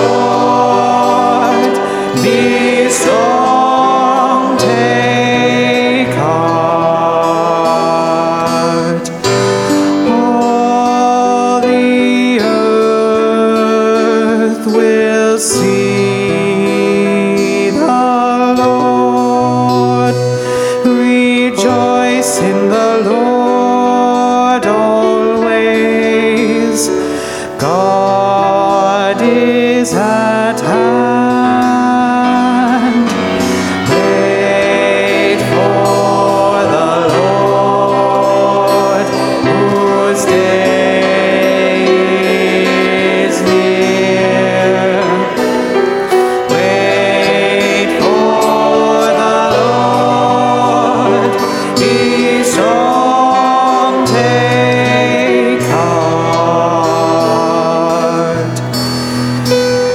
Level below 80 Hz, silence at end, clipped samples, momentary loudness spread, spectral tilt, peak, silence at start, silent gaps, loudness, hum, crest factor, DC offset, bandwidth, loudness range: -50 dBFS; 0 s; under 0.1%; 3 LU; -5 dB/octave; 0 dBFS; 0 s; none; -11 LUFS; none; 10 dB; under 0.1%; 16.5 kHz; 1 LU